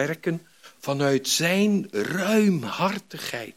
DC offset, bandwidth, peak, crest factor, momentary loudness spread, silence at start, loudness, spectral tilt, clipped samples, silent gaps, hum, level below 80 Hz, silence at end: under 0.1%; 16.5 kHz; -8 dBFS; 16 dB; 11 LU; 0 s; -24 LUFS; -4.5 dB/octave; under 0.1%; none; none; -74 dBFS; 0.05 s